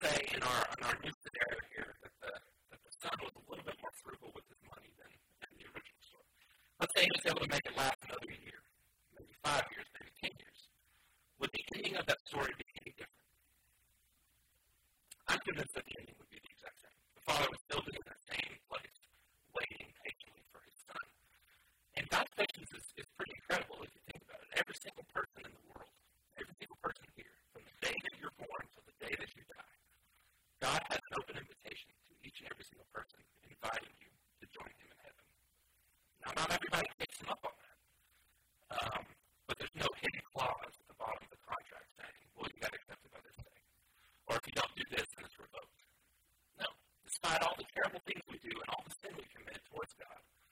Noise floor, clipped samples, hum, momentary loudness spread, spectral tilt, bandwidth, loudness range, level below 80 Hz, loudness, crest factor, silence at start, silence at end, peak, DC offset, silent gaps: -76 dBFS; under 0.1%; none; 22 LU; -2.5 dB/octave; 16 kHz; 11 LU; -68 dBFS; -41 LUFS; 28 dB; 0 s; 0.3 s; -16 dBFS; under 0.1%; 1.14-1.21 s, 7.95-7.99 s, 12.20-12.25 s, 17.61-17.65 s, 36.94-36.98 s